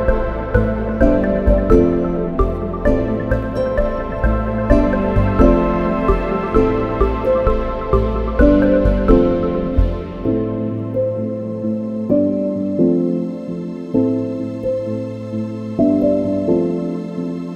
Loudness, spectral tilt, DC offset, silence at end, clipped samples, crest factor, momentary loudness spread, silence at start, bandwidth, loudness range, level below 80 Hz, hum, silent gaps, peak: -18 LUFS; -9.5 dB/octave; under 0.1%; 0 s; under 0.1%; 16 dB; 9 LU; 0 s; 6.6 kHz; 4 LU; -22 dBFS; none; none; 0 dBFS